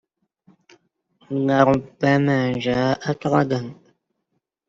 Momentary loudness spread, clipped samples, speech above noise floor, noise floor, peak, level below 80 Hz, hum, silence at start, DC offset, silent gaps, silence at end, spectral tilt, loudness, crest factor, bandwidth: 8 LU; under 0.1%; 56 dB; -75 dBFS; -2 dBFS; -56 dBFS; none; 1.3 s; under 0.1%; none; 0.95 s; -7 dB/octave; -20 LUFS; 20 dB; 7.6 kHz